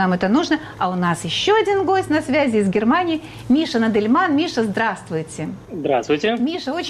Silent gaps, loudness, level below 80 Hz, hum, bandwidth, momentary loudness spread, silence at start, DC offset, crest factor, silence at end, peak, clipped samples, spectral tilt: none; -19 LUFS; -52 dBFS; none; 12.5 kHz; 10 LU; 0 s; under 0.1%; 12 dB; 0 s; -8 dBFS; under 0.1%; -5.5 dB/octave